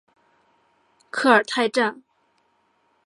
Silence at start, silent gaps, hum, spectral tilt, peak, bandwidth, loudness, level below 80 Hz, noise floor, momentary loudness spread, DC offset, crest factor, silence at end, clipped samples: 1.15 s; none; none; -3.5 dB/octave; -2 dBFS; 11.5 kHz; -20 LUFS; -80 dBFS; -66 dBFS; 8 LU; under 0.1%; 24 dB; 1.1 s; under 0.1%